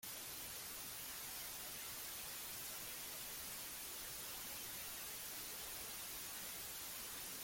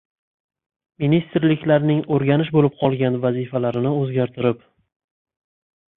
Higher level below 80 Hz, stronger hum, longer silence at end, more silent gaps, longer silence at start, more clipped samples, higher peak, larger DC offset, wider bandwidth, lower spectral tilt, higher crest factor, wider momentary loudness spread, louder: second, -72 dBFS vs -58 dBFS; neither; second, 0 s vs 1.4 s; neither; second, 0 s vs 1 s; neither; second, -36 dBFS vs -4 dBFS; neither; first, 17 kHz vs 4 kHz; second, -0.5 dB/octave vs -11.5 dB/octave; about the same, 14 dB vs 18 dB; second, 1 LU vs 5 LU; second, -46 LUFS vs -20 LUFS